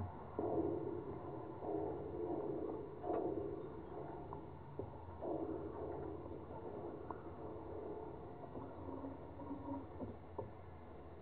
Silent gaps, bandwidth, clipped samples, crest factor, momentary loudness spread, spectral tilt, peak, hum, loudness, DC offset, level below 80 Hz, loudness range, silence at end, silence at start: none; 4.4 kHz; under 0.1%; 20 dB; 10 LU; -9 dB/octave; -28 dBFS; none; -47 LUFS; 0.1%; -64 dBFS; 6 LU; 0 s; 0 s